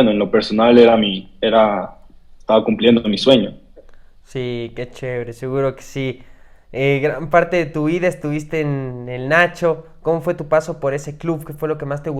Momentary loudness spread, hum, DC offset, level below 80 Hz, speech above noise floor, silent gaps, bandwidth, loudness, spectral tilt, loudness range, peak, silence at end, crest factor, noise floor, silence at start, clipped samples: 13 LU; none; under 0.1%; -46 dBFS; 24 dB; none; 14 kHz; -17 LUFS; -6.5 dB/octave; 8 LU; 0 dBFS; 0 s; 18 dB; -41 dBFS; 0 s; under 0.1%